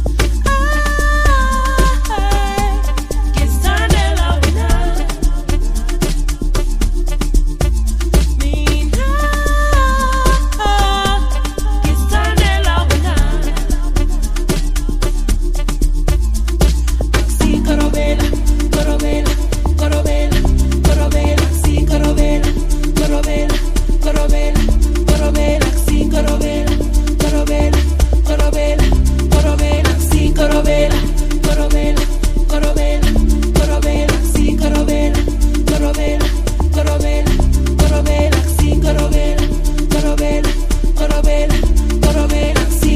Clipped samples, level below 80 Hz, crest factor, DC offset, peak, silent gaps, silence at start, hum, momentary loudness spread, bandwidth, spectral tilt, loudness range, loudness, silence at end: under 0.1%; -14 dBFS; 12 dB; 0.5%; 0 dBFS; none; 0 s; none; 5 LU; 15.5 kHz; -5.5 dB/octave; 3 LU; -15 LUFS; 0 s